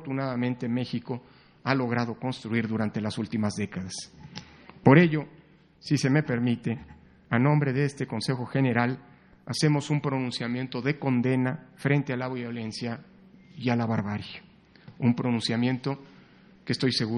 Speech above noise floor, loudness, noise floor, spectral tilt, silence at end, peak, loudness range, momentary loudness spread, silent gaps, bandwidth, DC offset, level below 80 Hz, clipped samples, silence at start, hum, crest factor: 28 dB; -27 LUFS; -54 dBFS; -6.5 dB/octave; 0 s; -2 dBFS; 5 LU; 13 LU; none; 10 kHz; under 0.1%; -64 dBFS; under 0.1%; 0 s; none; 26 dB